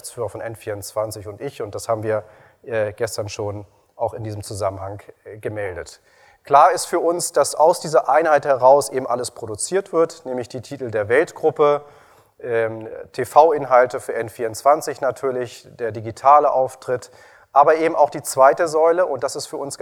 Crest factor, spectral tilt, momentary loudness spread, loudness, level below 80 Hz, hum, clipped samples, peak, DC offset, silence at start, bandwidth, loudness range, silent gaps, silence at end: 20 dB; -4 dB/octave; 16 LU; -19 LUFS; -60 dBFS; none; under 0.1%; 0 dBFS; under 0.1%; 0.05 s; 18 kHz; 10 LU; none; 0.05 s